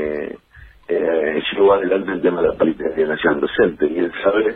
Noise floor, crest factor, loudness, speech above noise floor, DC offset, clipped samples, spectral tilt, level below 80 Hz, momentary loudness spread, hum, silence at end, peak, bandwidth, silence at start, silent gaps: -45 dBFS; 14 dB; -18 LUFS; 27 dB; under 0.1%; under 0.1%; -8.5 dB/octave; -48 dBFS; 9 LU; none; 0 s; -4 dBFS; 4 kHz; 0 s; none